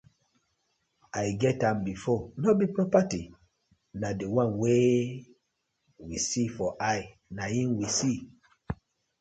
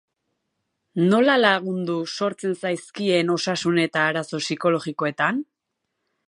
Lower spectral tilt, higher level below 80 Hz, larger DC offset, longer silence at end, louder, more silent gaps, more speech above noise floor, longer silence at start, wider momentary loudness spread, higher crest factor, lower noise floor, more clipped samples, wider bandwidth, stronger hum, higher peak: about the same, -5.5 dB/octave vs -5 dB/octave; first, -56 dBFS vs -74 dBFS; neither; second, 0.45 s vs 0.85 s; second, -28 LUFS vs -22 LUFS; neither; second, 51 dB vs 58 dB; first, 1.15 s vs 0.95 s; first, 16 LU vs 10 LU; about the same, 20 dB vs 20 dB; about the same, -79 dBFS vs -79 dBFS; neither; second, 9.4 kHz vs 11 kHz; neither; second, -10 dBFS vs -2 dBFS